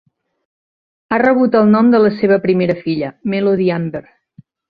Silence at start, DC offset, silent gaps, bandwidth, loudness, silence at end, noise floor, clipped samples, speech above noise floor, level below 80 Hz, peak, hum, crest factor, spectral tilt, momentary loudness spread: 1.1 s; under 0.1%; none; 5 kHz; -14 LUFS; 0.7 s; -47 dBFS; under 0.1%; 34 dB; -56 dBFS; -2 dBFS; none; 14 dB; -10 dB/octave; 10 LU